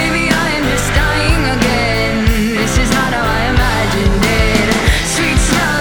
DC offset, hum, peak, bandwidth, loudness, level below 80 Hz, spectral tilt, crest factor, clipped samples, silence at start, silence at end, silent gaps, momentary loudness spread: under 0.1%; none; -2 dBFS; over 20 kHz; -13 LUFS; -18 dBFS; -4.5 dB/octave; 12 dB; under 0.1%; 0 s; 0 s; none; 2 LU